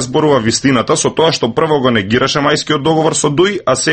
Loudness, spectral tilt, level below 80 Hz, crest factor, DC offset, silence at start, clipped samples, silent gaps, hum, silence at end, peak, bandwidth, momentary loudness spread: -12 LUFS; -4 dB/octave; -44 dBFS; 12 dB; under 0.1%; 0 s; under 0.1%; none; none; 0 s; 0 dBFS; 9 kHz; 2 LU